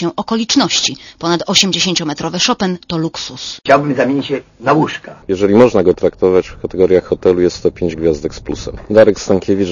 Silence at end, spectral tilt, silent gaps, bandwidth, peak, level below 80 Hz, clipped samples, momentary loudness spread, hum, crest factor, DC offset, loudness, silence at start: 0 s; -4 dB/octave; none; 11 kHz; 0 dBFS; -40 dBFS; 0.3%; 12 LU; none; 14 dB; under 0.1%; -14 LUFS; 0 s